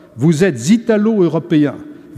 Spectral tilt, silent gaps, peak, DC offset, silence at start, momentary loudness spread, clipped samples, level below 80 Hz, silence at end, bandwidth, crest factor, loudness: -6.5 dB/octave; none; -2 dBFS; under 0.1%; 0.15 s; 4 LU; under 0.1%; -56 dBFS; 0 s; 13.5 kHz; 12 dB; -14 LUFS